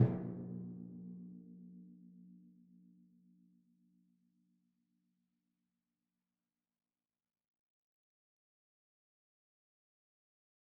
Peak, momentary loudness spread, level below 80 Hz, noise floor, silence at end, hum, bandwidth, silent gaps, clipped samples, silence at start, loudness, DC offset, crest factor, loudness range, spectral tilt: -16 dBFS; 22 LU; -76 dBFS; under -90 dBFS; 8.2 s; none; 2.2 kHz; none; under 0.1%; 0 s; -45 LUFS; under 0.1%; 32 dB; 17 LU; -11 dB/octave